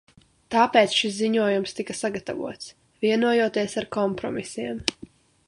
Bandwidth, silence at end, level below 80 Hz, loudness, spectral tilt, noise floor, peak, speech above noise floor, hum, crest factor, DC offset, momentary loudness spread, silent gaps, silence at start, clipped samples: 11.5 kHz; 0.4 s; -60 dBFS; -24 LUFS; -4 dB/octave; -48 dBFS; -2 dBFS; 24 dB; none; 24 dB; under 0.1%; 13 LU; none; 0.5 s; under 0.1%